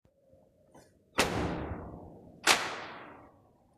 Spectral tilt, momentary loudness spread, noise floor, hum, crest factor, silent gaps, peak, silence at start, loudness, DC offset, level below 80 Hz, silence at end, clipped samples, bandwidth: -2.5 dB/octave; 23 LU; -64 dBFS; none; 28 dB; none; -8 dBFS; 0.75 s; -31 LUFS; under 0.1%; -54 dBFS; 0.5 s; under 0.1%; 14.5 kHz